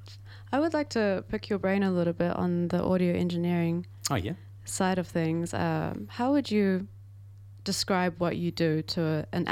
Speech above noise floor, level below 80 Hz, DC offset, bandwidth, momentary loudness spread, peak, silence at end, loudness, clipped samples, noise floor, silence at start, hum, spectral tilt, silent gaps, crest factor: 20 dB; -56 dBFS; under 0.1%; 16 kHz; 6 LU; -10 dBFS; 0 s; -29 LUFS; under 0.1%; -48 dBFS; 0 s; none; -6 dB/octave; none; 20 dB